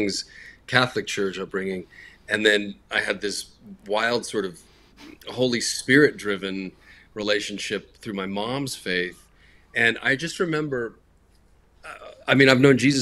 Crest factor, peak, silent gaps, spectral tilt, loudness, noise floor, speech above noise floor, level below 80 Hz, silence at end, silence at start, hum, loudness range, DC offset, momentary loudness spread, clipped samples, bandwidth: 24 dB; 0 dBFS; none; -4 dB/octave; -23 LUFS; -58 dBFS; 34 dB; -58 dBFS; 0 s; 0 s; none; 3 LU; under 0.1%; 19 LU; under 0.1%; 14 kHz